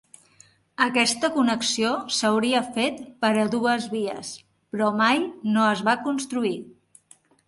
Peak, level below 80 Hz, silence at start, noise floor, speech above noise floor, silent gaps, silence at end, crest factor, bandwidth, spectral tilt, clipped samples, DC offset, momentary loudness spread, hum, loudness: -6 dBFS; -68 dBFS; 0.8 s; -57 dBFS; 34 dB; none; 0.8 s; 20 dB; 11.5 kHz; -3.5 dB/octave; under 0.1%; under 0.1%; 9 LU; none; -23 LUFS